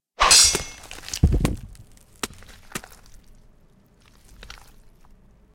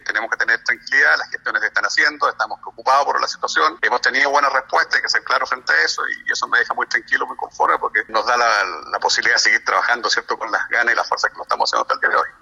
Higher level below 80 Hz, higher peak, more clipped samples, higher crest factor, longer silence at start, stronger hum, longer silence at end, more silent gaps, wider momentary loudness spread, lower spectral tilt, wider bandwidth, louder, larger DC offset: first, -34 dBFS vs -62 dBFS; about the same, -2 dBFS vs -4 dBFS; neither; first, 24 dB vs 16 dB; first, 0.2 s vs 0.05 s; neither; first, 2.75 s vs 0.1 s; neither; first, 24 LU vs 6 LU; first, -2 dB/octave vs 0.5 dB/octave; first, 17 kHz vs 12.5 kHz; about the same, -17 LUFS vs -17 LUFS; neither